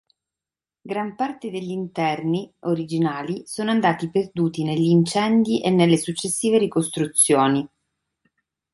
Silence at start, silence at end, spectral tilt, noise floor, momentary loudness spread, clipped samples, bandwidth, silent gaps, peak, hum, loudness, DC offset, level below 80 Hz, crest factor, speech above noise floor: 0.85 s; 1.05 s; -5 dB/octave; under -90 dBFS; 11 LU; under 0.1%; 12 kHz; none; -4 dBFS; none; -21 LUFS; under 0.1%; -62 dBFS; 18 dB; over 69 dB